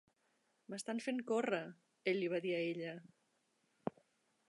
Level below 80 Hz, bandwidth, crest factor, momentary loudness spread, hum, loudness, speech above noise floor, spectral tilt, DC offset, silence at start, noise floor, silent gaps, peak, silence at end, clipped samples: -90 dBFS; 11 kHz; 22 dB; 11 LU; none; -41 LUFS; 41 dB; -5 dB/octave; under 0.1%; 0.7 s; -80 dBFS; none; -22 dBFS; 0.6 s; under 0.1%